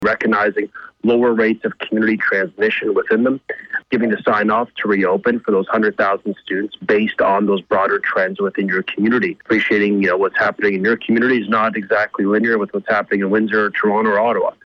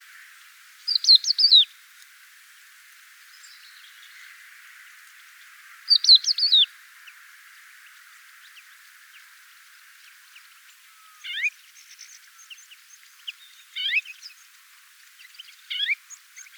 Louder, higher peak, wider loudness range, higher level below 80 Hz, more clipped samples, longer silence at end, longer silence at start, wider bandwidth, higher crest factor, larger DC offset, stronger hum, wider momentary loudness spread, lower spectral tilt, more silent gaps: about the same, -17 LUFS vs -18 LUFS; about the same, -6 dBFS vs -4 dBFS; second, 1 LU vs 15 LU; first, -58 dBFS vs under -90 dBFS; neither; second, 0.15 s vs 0.45 s; second, 0 s vs 0.85 s; second, 6.4 kHz vs over 20 kHz; second, 10 dB vs 24 dB; neither; neither; second, 5 LU vs 30 LU; first, -7.5 dB/octave vs 11 dB/octave; neither